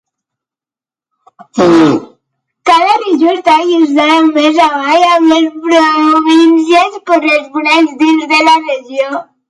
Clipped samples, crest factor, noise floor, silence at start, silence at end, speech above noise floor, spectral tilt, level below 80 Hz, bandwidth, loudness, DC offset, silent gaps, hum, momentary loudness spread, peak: under 0.1%; 10 dB; under -90 dBFS; 1.55 s; 0.25 s; over 81 dB; -4.5 dB/octave; -54 dBFS; 11 kHz; -9 LUFS; under 0.1%; none; none; 7 LU; 0 dBFS